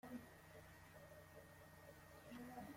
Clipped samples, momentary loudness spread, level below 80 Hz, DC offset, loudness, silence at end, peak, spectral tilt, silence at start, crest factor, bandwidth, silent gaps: under 0.1%; 6 LU; -76 dBFS; under 0.1%; -60 LUFS; 0 s; -42 dBFS; -5.5 dB/octave; 0.05 s; 18 dB; 16.5 kHz; none